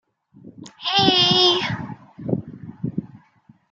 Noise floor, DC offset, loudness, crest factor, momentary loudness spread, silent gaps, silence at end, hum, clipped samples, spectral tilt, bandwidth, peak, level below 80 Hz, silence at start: -55 dBFS; under 0.1%; -18 LUFS; 20 dB; 19 LU; none; 0.55 s; none; under 0.1%; -4.5 dB/octave; 7.8 kHz; -2 dBFS; -58 dBFS; 0.45 s